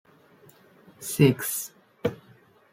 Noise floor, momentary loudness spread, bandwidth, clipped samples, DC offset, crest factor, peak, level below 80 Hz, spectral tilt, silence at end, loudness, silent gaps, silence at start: -57 dBFS; 16 LU; 16.5 kHz; under 0.1%; under 0.1%; 24 dB; -6 dBFS; -64 dBFS; -5.5 dB/octave; 0.6 s; -26 LUFS; none; 1 s